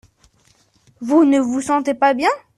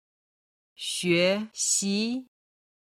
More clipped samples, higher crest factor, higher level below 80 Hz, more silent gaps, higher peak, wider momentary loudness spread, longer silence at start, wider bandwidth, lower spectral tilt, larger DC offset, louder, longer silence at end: neither; about the same, 16 dB vs 20 dB; first, -60 dBFS vs -72 dBFS; neither; first, -2 dBFS vs -10 dBFS; second, 5 LU vs 11 LU; first, 1 s vs 0.8 s; second, 12 kHz vs 16 kHz; about the same, -4 dB/octave vs -3 dB/octave; neither; first, -16 LUFS vs -26 LUFS; second, 0.2 s vs 0.7 s